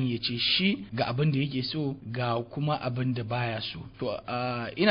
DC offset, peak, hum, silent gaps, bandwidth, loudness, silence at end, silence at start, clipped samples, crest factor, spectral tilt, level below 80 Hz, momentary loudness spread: under 0.1%; -10 dBFS; none; none; 5.4 kHz; -29 LUFS; 0 s; 0 s; under 0.1%; 18 dB; -10 dB/octave; -58 dBFS; 9 LU